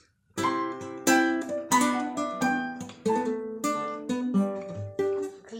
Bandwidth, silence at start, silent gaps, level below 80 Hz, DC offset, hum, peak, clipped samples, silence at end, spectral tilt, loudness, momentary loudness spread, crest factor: 16.5 kHz; 0.35 s; none; -70 dBFS; under 0.1%; none; -8 dBFS; under 0.1%; 0 s; -4 dB/octave; -28 LUFS; 10 LU; 20 dB